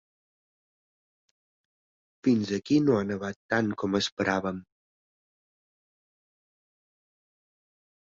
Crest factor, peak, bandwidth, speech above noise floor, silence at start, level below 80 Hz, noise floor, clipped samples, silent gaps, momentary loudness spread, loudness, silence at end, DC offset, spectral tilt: 22 dB; -10 dBFS; 7.8 kHz; over 63 dB; 2.25 s; -64 dBFS; under -90 dBFS; under 0.1%; 3.36-3.49 s, 4.12-4.17 s; 10 LU; -27 LUFS; 3.4 s; under 0.1%; -5.5 dB/octave